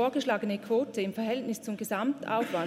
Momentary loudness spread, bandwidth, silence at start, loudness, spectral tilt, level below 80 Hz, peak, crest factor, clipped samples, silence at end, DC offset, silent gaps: 4 LU; 16 kHz; 0 s; -31 LUFS; -5 dB/octave; -80 dBFS; -14 dBFS; 16 dB; under 0.1%; 0 s; under 0.1%; none